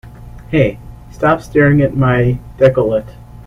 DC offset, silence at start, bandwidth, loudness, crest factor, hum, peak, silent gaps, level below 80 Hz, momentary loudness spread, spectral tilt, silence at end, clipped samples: under 0.1%; 0.05 s; 11.5 kHz; -14 LUFS; 14 dB; none; 0 dBFS; none; -34 dBFS; 6 LU; -8.5 dB/octave; 0.05 s; under 0.1%